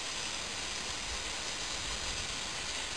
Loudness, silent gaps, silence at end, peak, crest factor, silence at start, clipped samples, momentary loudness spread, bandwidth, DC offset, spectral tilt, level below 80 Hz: -35 LUFS; none; 0 s; -24 dBFS; 16 dB; 0 s; under 0.1%; 1 LU; 11 kHz; 0.3%; -0.5 dB/octave; -52 dBFS